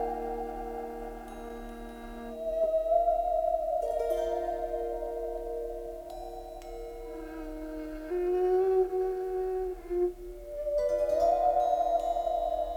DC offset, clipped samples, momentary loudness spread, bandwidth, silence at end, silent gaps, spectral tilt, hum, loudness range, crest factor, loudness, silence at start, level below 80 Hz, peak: under 0.1%; under 0.1%; 16 LU; 18.5 kHz; 0 s; none; -6.5 dB/octave; none; 8 LU; 16 dB; -31 LUFS; 0 s; -48 dBFS; -16 dBFS